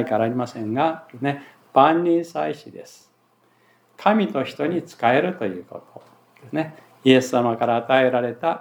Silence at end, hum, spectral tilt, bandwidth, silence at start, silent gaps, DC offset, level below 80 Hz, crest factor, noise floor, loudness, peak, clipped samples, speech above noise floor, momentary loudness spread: 0 s; none; -6 dB/octave; 18.5 kHz; 0 s; none; under 0.1%; -78 dBFS; 20 dB; -61 dBFS; -21 LUFS; -2 dBFS; under 0.1%; 40 dB; 16 LU